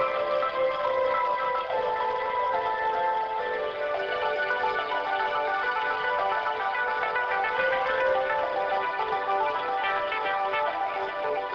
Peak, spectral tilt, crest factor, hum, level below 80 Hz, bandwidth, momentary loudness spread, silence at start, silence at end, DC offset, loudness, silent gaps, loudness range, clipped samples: -12 dBFS; -4 dB/octave; 16 dB; none; -62 dBFS; 7.2 kHz; 3 LU; 0 s; 0 s; under 0.1%; -27 LUFS; none; 1 LU; under 0.1%